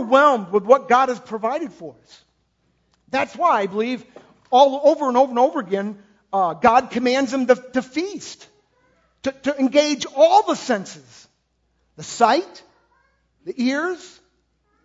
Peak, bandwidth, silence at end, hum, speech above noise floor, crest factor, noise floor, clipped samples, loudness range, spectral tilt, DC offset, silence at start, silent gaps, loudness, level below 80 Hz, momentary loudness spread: 0 dBFS; 8 kHz; 0.75 s; none; 49 dB; 20 dB; -68 dBFS; under 0.1%; 6 LU; -4 dB/octave; under 0.1%; 0 s; none; -19 LUFS; -62 dBFS; 18 LU